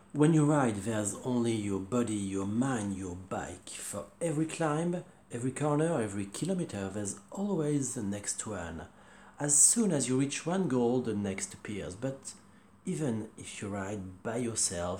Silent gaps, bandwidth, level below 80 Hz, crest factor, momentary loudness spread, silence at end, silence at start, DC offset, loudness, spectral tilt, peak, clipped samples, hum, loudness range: none; 17.5 kHz; -64 dBFS; 24 dB; 13 LU; 0 s; 0.15 s; under 0.1%; -31 LUFS; -4.5 dB/octave; -8 dBFS; under 0.1%; none; 7 LU